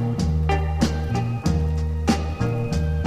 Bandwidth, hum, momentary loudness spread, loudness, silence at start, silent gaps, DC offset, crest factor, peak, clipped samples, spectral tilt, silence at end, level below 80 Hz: 12 kHz; none; 3 LU; -23 LUFS; 0 s; none; under 0.1%; 16 dB; -6 dBFS; under 0.1%; -6.5 dB/octave; 0 s; -28 dBFS